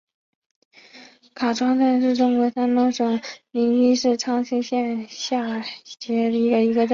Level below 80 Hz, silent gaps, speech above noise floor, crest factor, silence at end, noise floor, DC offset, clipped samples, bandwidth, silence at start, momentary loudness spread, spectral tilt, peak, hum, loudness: -68 dBFS; none; 28 dB; 14 dB; 0 s; -48 dBFS; under 0.1%; under 0.1%; 7.4 kHz; 0.95 s; 9 LU; -4.5 dB/octave; -8 dBFS; none; -21 LUFS